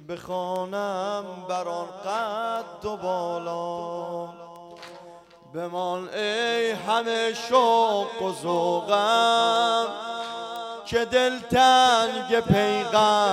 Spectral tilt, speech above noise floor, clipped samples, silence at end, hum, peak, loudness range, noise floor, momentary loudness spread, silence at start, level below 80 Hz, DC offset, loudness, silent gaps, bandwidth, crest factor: -4 dB/octave; 24 dB; under 0.1%; 0 s; none; -6 dBFS; 10 LU; -48 dBFS; 14 LU; 0 s; -58 dBFS; under 0.1%; -24 LUFS; none; 16 kHz; 18 dB